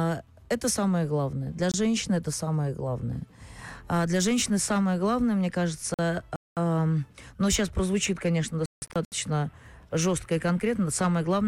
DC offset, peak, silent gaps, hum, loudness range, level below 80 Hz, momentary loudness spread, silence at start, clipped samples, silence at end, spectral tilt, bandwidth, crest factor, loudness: under 0.1%; -16 dBFS; 5.94-5.98 s, 6.36-6.56 s, 8.66-8.82 s, 9.05-9.11 s; none; 2 LU; -48 dBFS; 8 LU; 0 s; under 0.1%; 0 s; -5 dB/octave; 16 kHz; 10 dB; -27 LUFS